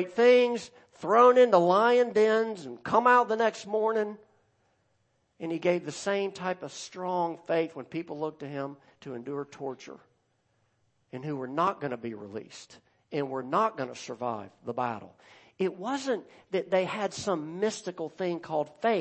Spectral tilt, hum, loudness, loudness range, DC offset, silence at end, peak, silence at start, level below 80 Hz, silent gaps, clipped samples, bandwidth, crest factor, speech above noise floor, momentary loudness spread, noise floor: -5 dB/octave; none; -28 LUFS; 13 LU; under 0.1%; 0 s; -8 dBFS; 0 s; -76 dBFS; none; under 0.1%; 8.6 kHz; 20 dB; 45 dB; 18 LU; -73 dBFS